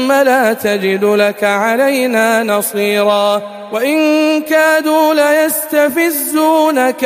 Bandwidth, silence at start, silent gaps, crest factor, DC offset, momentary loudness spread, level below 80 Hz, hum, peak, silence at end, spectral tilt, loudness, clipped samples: 15.5 kHz; 0 s; none; 12 dB; under 0.1%; 4 LU; -62 dBFS; none; 0 dBFS; 0 s; -3.5 dB/octave; -12 LUFS; under 0.1%